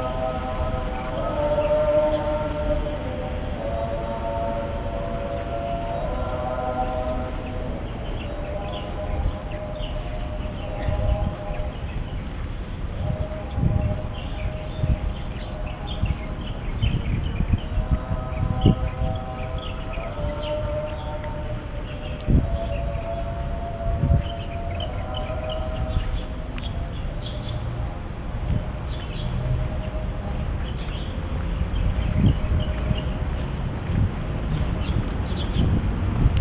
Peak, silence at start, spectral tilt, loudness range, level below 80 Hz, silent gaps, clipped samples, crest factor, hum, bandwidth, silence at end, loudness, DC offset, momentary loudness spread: -2 dBFS; 0 s; -11 dB/octave; 5 LU; -28 dBFS; none; under 0.1%; 22 dB; none; 4 kHz; 0 s; -27 LUFS; under 0.1%; 9 LU